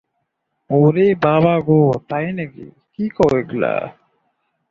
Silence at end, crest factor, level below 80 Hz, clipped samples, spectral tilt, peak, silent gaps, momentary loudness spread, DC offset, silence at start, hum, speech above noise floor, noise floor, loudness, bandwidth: 0.8 s; 16 dB; -50 dBFS; under 0.1%; -9 dB/octave; -2 dBFS; none; 13 LU; under 0.1%; 0.7 s; none; 57 dB; -73 dBFS; -17 LUFS; 7.2 kHz